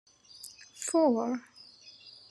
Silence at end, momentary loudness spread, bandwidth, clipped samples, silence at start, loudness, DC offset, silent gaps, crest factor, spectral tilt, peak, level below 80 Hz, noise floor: 0.2 s; 24 LU; 13 kHz; under 0.1%; 0.4 s; -29 LUFS; under 0.1%; none; 18 dB; -3.5 dB/octave; -14 dBFS; -86 dBFS; -54 dBFS